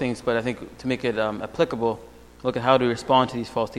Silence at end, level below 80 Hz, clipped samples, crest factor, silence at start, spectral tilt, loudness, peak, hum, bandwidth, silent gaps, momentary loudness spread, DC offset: 0 s; -52 dBFS; under 0.1%; 20 dB; 0 s; -6 dB/octave; -24 LUFS; -4 dBFS; none; 13.5 kHz; none; 10 LU; under 0.1%